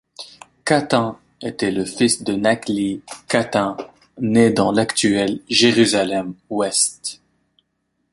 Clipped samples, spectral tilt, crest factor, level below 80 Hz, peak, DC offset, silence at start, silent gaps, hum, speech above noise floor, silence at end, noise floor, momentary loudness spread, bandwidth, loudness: under 0.1%; -3.5 dB/octave; 18 dB; -56 dBFS; 0 dBFS; under 0.1%; 0.2 s; none; none; 53 dB; 1 s; -71 dBFS; 15 LU; 11.5 kHz; -18 LUFS